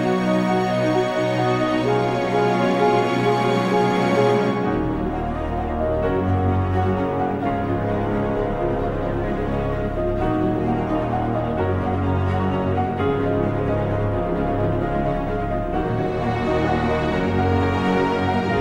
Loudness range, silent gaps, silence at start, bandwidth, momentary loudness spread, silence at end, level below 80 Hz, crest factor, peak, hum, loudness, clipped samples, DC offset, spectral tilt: 3 LU; none; 0 s; 12 kHz; 5 LU; 0 s; -34 dBFS; 14 dB; -6 dBFS; none; -21 LUFS; under 0.1%; under 0.1%; -7.5 dB/octave